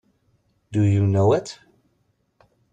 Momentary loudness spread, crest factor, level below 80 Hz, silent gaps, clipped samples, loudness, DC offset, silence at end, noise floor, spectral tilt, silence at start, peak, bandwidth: 19 LU; 16 dB; -56 dBFS; none; under 0.1%; -20 LUFS; under 0.1%; 1.2 s; -68 dBFS; -8 dB/octave; 0.7 s; -6 dBFS; 8.8 kHz